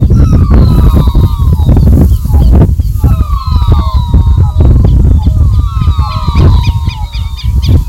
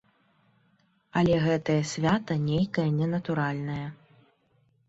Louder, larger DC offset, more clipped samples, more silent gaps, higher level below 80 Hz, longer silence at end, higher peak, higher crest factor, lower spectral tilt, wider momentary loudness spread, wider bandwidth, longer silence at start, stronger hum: first, -8 LUFS vs -27 LUFS; neither; first, 3% vs under 0.1%; neither; first, -8 dBFS vs -58 dBFS; second, 0 s vs 0.95 s; first, 0 dBFS vs -12 dBFS; second, 6 dB vs 16 dB; first, -8.5 dB/octave vs -6.5 dB/octave; second, 6 LU vs 9 LU; first, 14 kHz vs 8 kHz; second, 0 s vs 1.15 s; neither